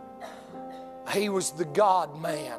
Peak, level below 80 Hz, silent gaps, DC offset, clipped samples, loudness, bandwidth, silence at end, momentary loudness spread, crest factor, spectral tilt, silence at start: -12 dBFS; -70 dBFS; none; under 0.1%; under 0.1%; -27 LUFS; 14.5 kHz; 0 s; 19 LU; 18 dB; -4 dB/octave; 0 s